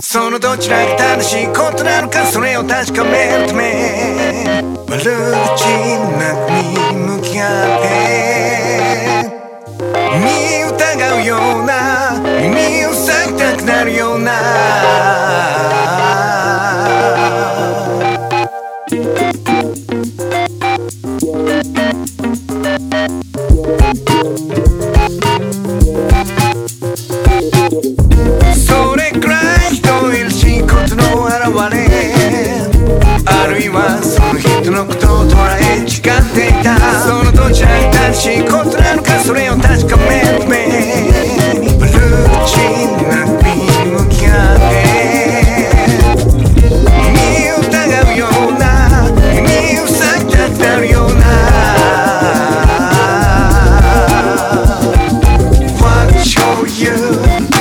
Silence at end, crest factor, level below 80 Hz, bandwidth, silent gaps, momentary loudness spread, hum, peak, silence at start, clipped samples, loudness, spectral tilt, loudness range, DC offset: 0 s; 10 dB; -16 dBFS; 18.5 kHz; none; 6 LU; none; 0 dBFS; 0 s; under 0.1%; -11 LUFS; -5 dB/octave; 5 LU; under 0.1%